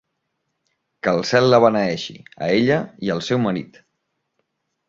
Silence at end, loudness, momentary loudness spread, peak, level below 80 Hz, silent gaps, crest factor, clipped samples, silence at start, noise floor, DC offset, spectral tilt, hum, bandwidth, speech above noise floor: 1.25 s; -19 LUFS; 13 LU; -2 dBFS; -58 dBFS; none; 20 dB; under 0.1%; 1.05 s; -75 dBFS; under 0.1%; -6 dB/octave; none; 7.8 kHz; 56 dB